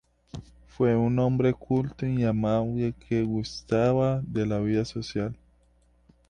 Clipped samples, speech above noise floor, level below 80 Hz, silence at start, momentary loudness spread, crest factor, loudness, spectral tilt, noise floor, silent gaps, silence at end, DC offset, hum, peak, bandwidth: under 0.1%; 37 dB; -50 dBFS; 0.35 s; 11 LU; 16 dB; -27 LUFS; -8 dB/octave; -63 dBFS; none; 0.95 s; under 0.1%; none; -10 dBFS; 9.6 kHz